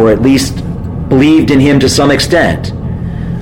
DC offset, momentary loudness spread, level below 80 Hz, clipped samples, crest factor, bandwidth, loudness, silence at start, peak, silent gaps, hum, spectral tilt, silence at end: under 0.1%; 12 LU; -26 dBFS; under 0.1%; 10 dB; 16.5 kHz; -10 LUFS; 0 s; 0 dBFS; none; none; -5.5 dB/octave; 0 s